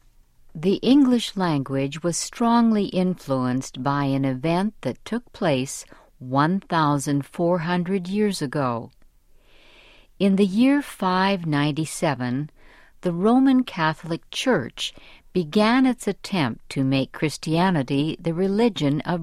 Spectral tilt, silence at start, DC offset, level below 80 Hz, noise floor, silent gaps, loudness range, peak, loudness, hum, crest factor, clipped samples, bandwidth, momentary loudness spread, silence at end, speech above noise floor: -5.5 dB/octave; 0.55 s; under 0.1%; -52 dBFS; -53 dBFS; none; 3 LU; -6 dBFS; -23 LUFS; none; 16 dB; under 0.1%; 14 kHz; 10 LU; 0 s; 31 dB